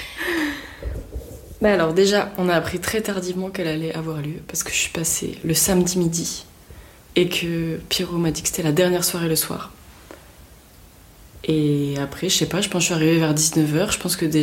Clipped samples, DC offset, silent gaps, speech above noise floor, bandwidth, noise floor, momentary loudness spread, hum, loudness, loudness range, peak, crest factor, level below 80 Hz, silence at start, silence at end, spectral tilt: under 0.1%; under 0.1%; none; 26 dB; 17 kHz; -47 dBFS; 12 LU; none; -21 LUFS; 4 LU; -6 dBFS; 16 dB; -44 dBFS; 0 s; 0 s; -4 dB/octave